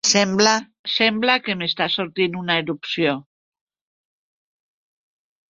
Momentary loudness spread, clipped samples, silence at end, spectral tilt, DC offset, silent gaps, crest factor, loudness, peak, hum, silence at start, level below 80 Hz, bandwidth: 7 LU; under 0.1%; 2.3 s; -2.5 dB/octave; under 0.1%; 0.79-0.84 s; 22 dB; -20 LUFS; -2 dBFS; none; 0.05 s; -64 dBFS; 7.8 kHz